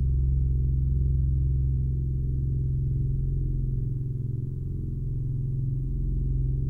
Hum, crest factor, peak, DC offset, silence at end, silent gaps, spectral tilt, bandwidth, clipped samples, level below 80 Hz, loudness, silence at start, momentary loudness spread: none; 10 dB; -16 dBFS; under 0.1%; 0 s; none; -13 dB/octave; 0.5 kHz; under 0.1%; -28 dBFS; -28 LUFS; 0 s; 6 LU